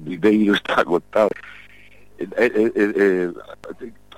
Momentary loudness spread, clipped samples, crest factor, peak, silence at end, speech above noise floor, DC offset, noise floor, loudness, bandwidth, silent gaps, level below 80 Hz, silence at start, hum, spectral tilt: 20 LU; under 0.1%; 14 dB; -6 dBFS; 0.3 s; 30 dB; 0.4%; -49 dBFS; -19 LUFS; 15.5 kHz; none; -56 dBFS; 0 s; 50 Hz at -50 dBFS; -6 dB/octave